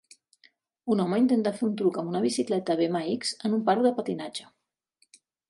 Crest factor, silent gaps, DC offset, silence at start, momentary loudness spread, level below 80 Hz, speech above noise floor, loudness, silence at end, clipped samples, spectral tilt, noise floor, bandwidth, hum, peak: 18 dB; none; under 0.1%; 0.85 s; 10 LU; -76 dBFS; 45 dB; -27 LUFS; 1.05 s; under 0.1%; -5.5 dB/octave; -71 dBFS; 11.5 kHz; none; -10 dBFS